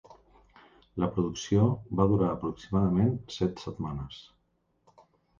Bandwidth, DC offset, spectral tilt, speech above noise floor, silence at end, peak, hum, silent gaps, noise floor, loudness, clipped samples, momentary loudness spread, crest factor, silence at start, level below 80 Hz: 7.4 kHz; under 0.1%; -7.5 dB/octave; 45 dB; 1.2 s; -10 dBFS; none; none; -73 dBFS; -29 LUFS; under 0.1%; 13 LU; 20 dB; 0.95 s; -50 dBFS